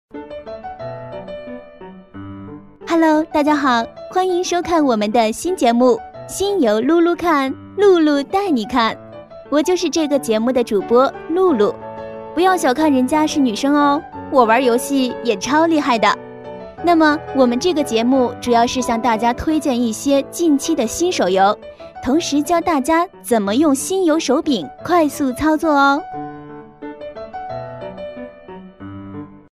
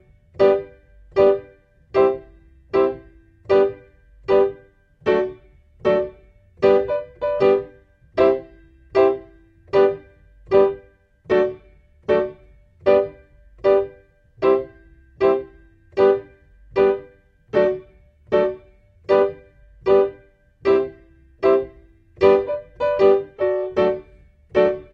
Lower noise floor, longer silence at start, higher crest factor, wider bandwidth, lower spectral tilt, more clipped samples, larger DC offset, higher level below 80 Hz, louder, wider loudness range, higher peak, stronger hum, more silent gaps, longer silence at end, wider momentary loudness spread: second, -38 dBFS vs -51 dBFS; second, 0.15 s vs 0.4 s; about the same, 16 dB vs 18 dB; first, 15.5 kHz vs 5.6 kHz; second, -4 dB/octave vs -7.5 dB/octave; neither; neither; about the same, -48 dBFS vs -50 dBFS; first, -16 LUFS vs -20 LUFS; about the same, 4 LU vs 2 LU; about the same, 0 dBFS vs -2 dBFS; neither; neither; about the same, 0.15 s vs 0.1 s; first, 19 LU vs 13 LU